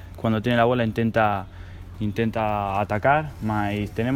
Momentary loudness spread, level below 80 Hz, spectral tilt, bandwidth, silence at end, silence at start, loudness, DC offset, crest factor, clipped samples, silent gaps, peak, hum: 10 LU; -44 dBFS; -7.5 dB/octave; 16.5 kHz; 0 s; 0 s; -23 LUFS; under 0.1%; 16 dB; under 0.1%; none; -6 dBFS; none